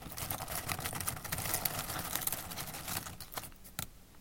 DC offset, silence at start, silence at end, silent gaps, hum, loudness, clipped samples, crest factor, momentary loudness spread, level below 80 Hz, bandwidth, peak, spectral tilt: under 0.1%; 0 s; 0 s; none; none; -38 LUFS; under 0.1%; 30 dB; 10 LU; -54 dBFS; 17 kHz; -10 dBFS; -2 dB/octave